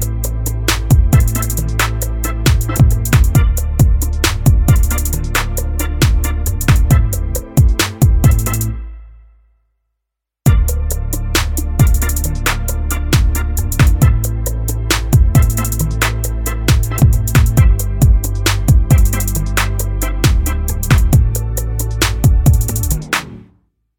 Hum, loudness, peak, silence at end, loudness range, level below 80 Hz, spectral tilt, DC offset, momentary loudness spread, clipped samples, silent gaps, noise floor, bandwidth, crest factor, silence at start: none; -15 LUFS; 0 dBFS; 0.6 s; 3 LU; -16 dBFS; -5 dB/octave; under 0.1%; 8 LU; under 0.1%; none; -78 dBFS; over 20 kHz; 12 dB; 0 s